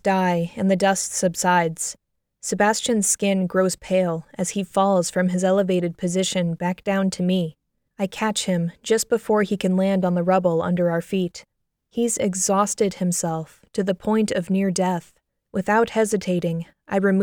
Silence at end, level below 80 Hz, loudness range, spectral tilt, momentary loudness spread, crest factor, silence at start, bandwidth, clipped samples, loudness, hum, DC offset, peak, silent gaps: 0 s; -58 dBFS; 2 LU; -5 dB/octave; 9 LU; 16 dB; 0.05 s; 17.5 kHz; under 0.1%; -22 LUFS; none; under 0.1%; -6 dBFS; none